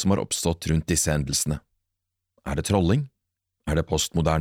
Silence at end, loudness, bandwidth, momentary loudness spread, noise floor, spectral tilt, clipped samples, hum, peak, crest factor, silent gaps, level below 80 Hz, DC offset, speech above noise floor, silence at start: 0 s; -24 LUFS; 17 kHz; 11 LU; -82 dBFS; -4.5 dB/octave; under 0.1%; none; -8 dBFS; 16 dB; none; -38 dBFS; under 0.1%; 59 dB; 0 s